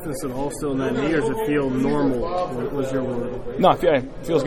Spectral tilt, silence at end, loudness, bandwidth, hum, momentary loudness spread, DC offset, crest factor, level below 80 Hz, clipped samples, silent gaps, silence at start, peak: -6.5 dB/octave; 0 s; -22 LUFS; 16.5 kHz; none; 8 LU; under 0.1%; 18 dB; -40 dBFS; under 0.1%; none; 0 s; -4 dBFS